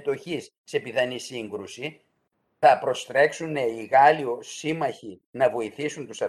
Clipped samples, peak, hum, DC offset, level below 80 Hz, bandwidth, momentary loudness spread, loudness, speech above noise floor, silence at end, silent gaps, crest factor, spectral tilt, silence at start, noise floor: under 0.1%; -4 dBFS; none; under 0.1%; -72 dBFS; 12.5 kHz; 16 LU; -24 LUFS; 49 dB; 0 s; 0.58-0.64 s, 5.26-5.33 s; 20 dB; -4 dB/octave; 0 s; -73 dBFS